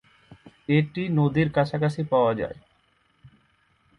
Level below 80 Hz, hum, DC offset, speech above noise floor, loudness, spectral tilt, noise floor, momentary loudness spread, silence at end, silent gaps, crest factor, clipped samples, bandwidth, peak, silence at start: -56 dBFS; none; under 0.1%; 43 dB; -24 LUFS; -8.5 dB/octave; -66 dBFS; 11 LU; 0.7 s; none; 16 dB; under 0.1%; 10 kHz; -10 dBFS; 0.3 s